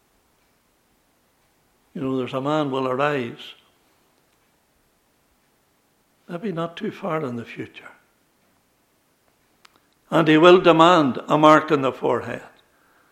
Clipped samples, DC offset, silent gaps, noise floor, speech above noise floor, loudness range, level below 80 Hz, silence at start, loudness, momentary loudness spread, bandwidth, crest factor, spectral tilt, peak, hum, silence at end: under 0.1%; under 0.1%; none; -64 dBFS; 45 dB; 18 LU; -66 dBFS; 1.95 s; -19 LUFS; 22 LU; 12.5 kHz; 22 dB; -6 dB/octave; 0 dBFS; none; 0.7 s